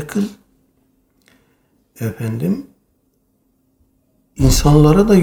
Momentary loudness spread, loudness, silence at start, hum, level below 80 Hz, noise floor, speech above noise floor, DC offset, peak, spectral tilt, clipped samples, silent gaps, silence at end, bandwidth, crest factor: 16 LU; -16 LUFS; 0 s; none; -28 dBFS; -62 dBFS; 49 dB; under 0.1%; 0 dBFS; -6.5 dB/octave; under 0.1%; none; 0 s; 18.5 kHz; 16 dB